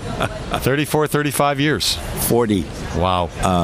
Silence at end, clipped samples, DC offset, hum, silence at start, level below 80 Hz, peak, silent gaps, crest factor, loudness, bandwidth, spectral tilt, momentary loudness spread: 0 s; under 0.1%; under 0.1%; none; 0 s; -34 dBFS; 0 dBFS; none; 18 dB; -19 LUFS; 16.5 kHz; -4.5 dB/octave; 5 LU